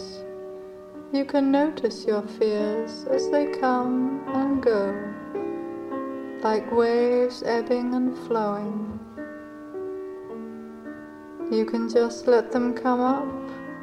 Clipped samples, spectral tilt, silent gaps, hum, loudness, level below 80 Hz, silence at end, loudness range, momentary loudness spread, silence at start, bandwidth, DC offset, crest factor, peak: under 0.1%; -6 dB/octave; none; none; -25 LUFS; -62 dBFS; 0 s; 6 LU; 17 LU; 0 s; 10.5 kHz; under 0.1%; 18 dB; -8 dBFS